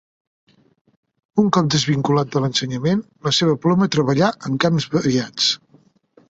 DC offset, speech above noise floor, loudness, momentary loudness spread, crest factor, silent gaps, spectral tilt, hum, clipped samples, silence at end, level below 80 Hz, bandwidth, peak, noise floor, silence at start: under 0.1%; 37 dB; -19 LUFS; 4 LU; 18 dB; none; -5 dB/octave; none; under 0.1%; 0.75 s; -56 dBFS; 8 kHz; -2 dBFS; -55 dBFS; 1.35 s